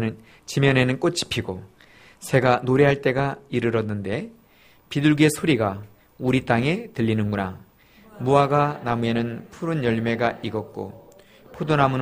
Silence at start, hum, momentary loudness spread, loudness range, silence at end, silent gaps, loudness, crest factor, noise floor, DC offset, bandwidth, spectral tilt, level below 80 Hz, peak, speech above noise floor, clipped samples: 0 s; none; 14 LU; 2 LU; 0 s; none; -22 LUFS; 20 dB; -54 dBFS; under 0.1%; 15.5 kHz; -6 dB/octave; -52 dBFS; -2 dBFS; 33 dB; under 0.1%